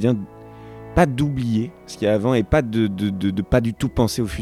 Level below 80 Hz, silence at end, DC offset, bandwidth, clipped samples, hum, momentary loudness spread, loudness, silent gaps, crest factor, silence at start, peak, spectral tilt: -36 dBFS; 0 s; under 0.1%; 15.5 kHz; under 0.1%; none; 12 LU; -21 LUFS; none; 18 dB; 0 s; -4 dBFS; -7 dB/octave